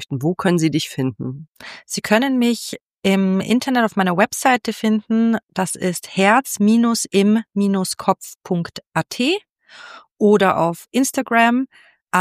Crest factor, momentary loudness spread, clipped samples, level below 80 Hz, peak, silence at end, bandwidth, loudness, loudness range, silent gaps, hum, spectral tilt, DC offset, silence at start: 18 dB; 10 LU; under 0.1%; -62 dBFS; 0 dBFS; 0 s; 15.5 kHz; -18 LUFS; 3 LU; 1.48-1.53 s, 2.81-2.88 s, 2.98-3.02 s, 8.35-8.39 s, 9.49-9.55 s, 10.12-10.16 s, 12.01-12.05 s; none; -5 dB/octave; under 0.1%; 0 s